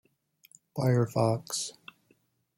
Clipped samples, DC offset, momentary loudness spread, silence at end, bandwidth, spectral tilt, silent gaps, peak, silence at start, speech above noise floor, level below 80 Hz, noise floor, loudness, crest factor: under 0.1%; under 0.1%; 15 LU; 0.85 s; 16 kHz; -5.5 dB/octave; none; -12 dBFS; 0.75 s; 42 dB; -68 dBFS; -70 dBFS; -29 LUFS; 20 dB